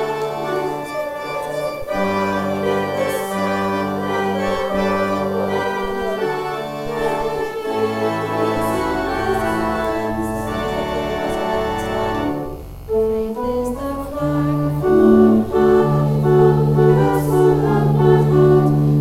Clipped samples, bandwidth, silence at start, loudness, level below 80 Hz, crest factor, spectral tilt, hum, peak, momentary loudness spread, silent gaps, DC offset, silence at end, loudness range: under 0.1%; 16 kHz; 0 s; -18 LUFS; -38 dBFS; 16 dB; -7.5 dB/octave; none; -2 dBFS; 10 LU; none; under 0.1%; 0 s; 7 LU